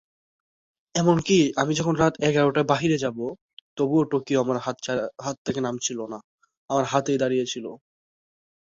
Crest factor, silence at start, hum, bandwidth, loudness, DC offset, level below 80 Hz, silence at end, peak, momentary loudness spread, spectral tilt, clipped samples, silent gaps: 20 dB; 0.95 s; none; 8 kHz; -24 LUFS; under 0.1%; -58 dBFS; 0.9 s; -4 dBFS; 13 LU; -5 dB/octave; under 0.1%; 3.41-3.77 s, 5.38-5.45 s, 6.24-6.38 s, 6.57-6.68 s